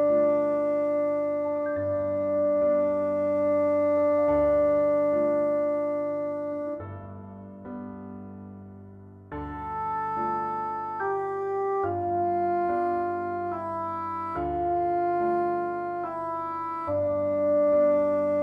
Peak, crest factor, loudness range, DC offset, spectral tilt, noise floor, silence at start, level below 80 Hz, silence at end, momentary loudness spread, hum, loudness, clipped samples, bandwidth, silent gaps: -14 dBFS; 12 dB; 10 LU; under 0.1%; -9.5 dB/octave; -46 dBFS; 0 s; -56 dBFS; 0 s; 16 LU; none; -26 LUFS; under 0.1%; 4.4 kHz; none